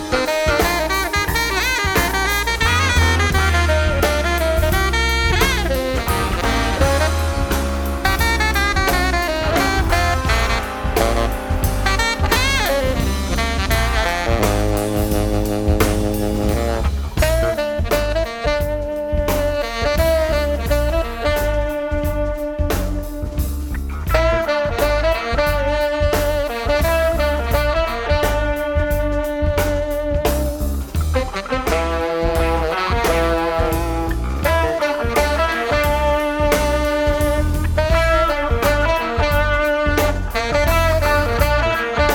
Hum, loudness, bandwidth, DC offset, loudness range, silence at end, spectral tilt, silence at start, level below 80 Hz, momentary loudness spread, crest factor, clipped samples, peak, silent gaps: none; -18 LUFS; 19 kHz; under 0.1%; 4 LU; 0 s; -4.5 dB/octave; 0 s; -22 dBFS; 5 LU; 16 dB; under 0.1%; -2 dBFS; none